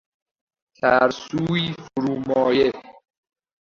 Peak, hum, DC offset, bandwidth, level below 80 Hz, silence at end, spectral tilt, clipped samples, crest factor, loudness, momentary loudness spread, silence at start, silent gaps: -2 dBFS; none; under 0.1%; 7.4 kHz; -58 dBFS; 0.7 s; -6 dB/octave; under 0.1%; 20 dB; -21 LUFS; 9 LU; 0.85 s; none